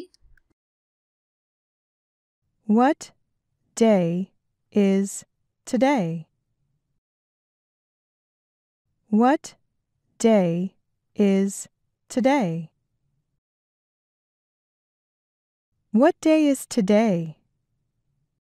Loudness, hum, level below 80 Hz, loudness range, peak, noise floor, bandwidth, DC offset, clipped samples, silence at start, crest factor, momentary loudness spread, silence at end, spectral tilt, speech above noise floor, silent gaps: -22 LUFS; none; -70 dBFS; 6 LU; -6 dBFS; -74 dBFS; 14 kHz; under 0.1%; under 0.1%; 0 s; 20 dB; 17 LU; 1.2 s; -6 dB/octave; 54 dB; 0.53-2.42 s, 6.98-8.85 s, 13.38-15.72 s